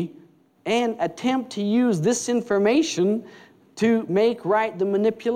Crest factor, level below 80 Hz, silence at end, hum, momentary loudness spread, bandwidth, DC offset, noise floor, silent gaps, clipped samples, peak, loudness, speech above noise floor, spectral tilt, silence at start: 12 dB; -70 dBFS; 0 s; none; 5 LU; 13.5 kHz; under 0.1%; -53 dBFS; none; under 0.1%; -10 dBFS; -22 LUFS; 31 dB; -5 dB/octave; 0 s